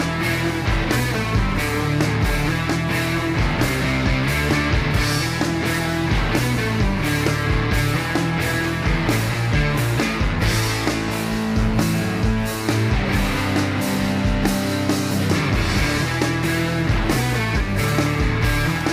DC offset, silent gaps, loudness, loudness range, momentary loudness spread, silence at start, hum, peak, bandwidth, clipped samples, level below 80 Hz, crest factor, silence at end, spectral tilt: under 0.1%; none; -20 LUFS; 1 LU; 2 LU; 0 s; none; -6 dBFS; 16 kHz; under 0.1%; -28 dBFS; 14 dB; 0 s; -5 dB/octave